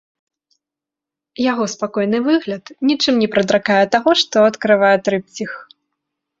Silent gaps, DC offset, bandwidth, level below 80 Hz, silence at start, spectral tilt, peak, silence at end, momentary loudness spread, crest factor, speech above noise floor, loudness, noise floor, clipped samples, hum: none; under 0.1%; 7.8 kHz; -60 dBFS; 1.4 s; -4.5 dB/octave; 0 dBFS; 0.75 s; 13 LU; 16 dB; 70 dB; -16 LUFS; -86 dBFS; under 0.1%; none